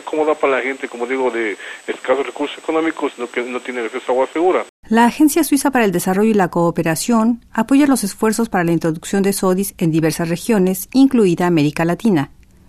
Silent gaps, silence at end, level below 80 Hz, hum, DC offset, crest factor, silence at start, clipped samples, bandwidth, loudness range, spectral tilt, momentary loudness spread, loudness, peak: 4.69-4.83 s; 0.4 s; -50 dBFS; none; under 0.1%; 14 dB; 0.05 s; under 0.1%; 14 kHz; 5 LU; -5.5 dB/octave; 10 LU; -17 LUFS; -2 dBFS